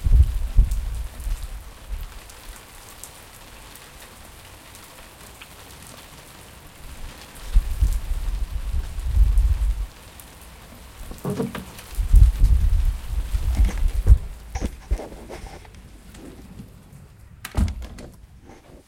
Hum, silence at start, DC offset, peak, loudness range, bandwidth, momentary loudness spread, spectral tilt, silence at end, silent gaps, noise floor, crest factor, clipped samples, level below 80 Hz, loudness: none; 0 s; under 0.1%; -2 dBFS; 19 LU; 16 kHz; 23 LU; -6 dB/octave; 0.1 s; none; -46 dBFS; 22 dB; under 0.1%; -24 dBFS; -25 LUFS